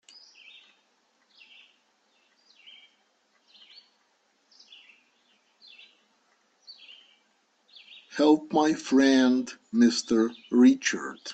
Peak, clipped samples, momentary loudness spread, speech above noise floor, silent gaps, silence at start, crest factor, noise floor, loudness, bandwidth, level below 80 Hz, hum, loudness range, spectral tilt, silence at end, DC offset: -8 dBFS; under 0.1%; 27 LU; 47 dB; none; 8.15 s; 20 dB; -70 dBFS; -23 LUFS; 8.4 kHz; -72 dBFS; none; 8 LU; -3.5 dB/octave; 0 s; under 0.1%